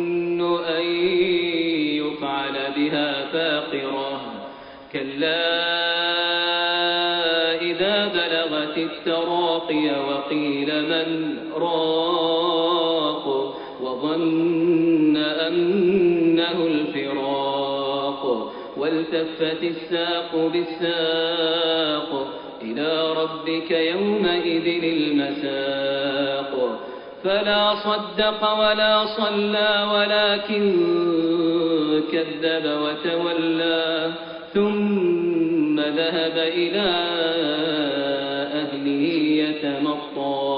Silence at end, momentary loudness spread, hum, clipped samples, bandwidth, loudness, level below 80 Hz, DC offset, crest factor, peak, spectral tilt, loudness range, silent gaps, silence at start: 0 s; 7 LU; none; under 0.1%; 5.2 kHz; -22 LUFS; -62 dBFS; under 0.1%; 16 dB; -6 dBFS; -2 dB/octave; 4 LU; none; 0 s